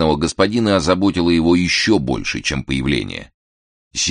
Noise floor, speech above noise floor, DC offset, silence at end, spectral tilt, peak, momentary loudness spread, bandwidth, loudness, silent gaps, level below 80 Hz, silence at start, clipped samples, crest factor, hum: under -90 dBFS; over 73 dB; under 0.1%; 0 s; -4.5 dB/octave; -2 dBFS; 7 LU; 10 kHz; -17 LUFS; 3.34-3.91 s; -36 dBFS; 0 s; under 0.1%; 16 dB; none